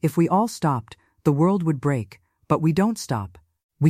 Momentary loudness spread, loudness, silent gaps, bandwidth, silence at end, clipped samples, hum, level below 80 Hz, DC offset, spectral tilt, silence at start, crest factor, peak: 9 LU; -23 LUFS; 3.63-3.69 s; 15 kHz; 0 s; under 0.1%; none; -56 dBFS; under 0.1%; -7.5 dB/octave; 0.05 s; 18 dB; -4 dBFS